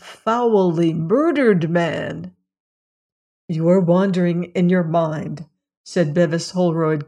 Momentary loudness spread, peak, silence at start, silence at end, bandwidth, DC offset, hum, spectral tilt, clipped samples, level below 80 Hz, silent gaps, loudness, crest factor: 12 LU; -4 dBFS; 0.05 s; 0.05 s; 10 kHz; under 0.1%; none; -7.5 dB/octave; under 0.1%; -64 dBFS; 2.60-3.48 s, 5.77-5.84 s; -18 LUFS; 16 dB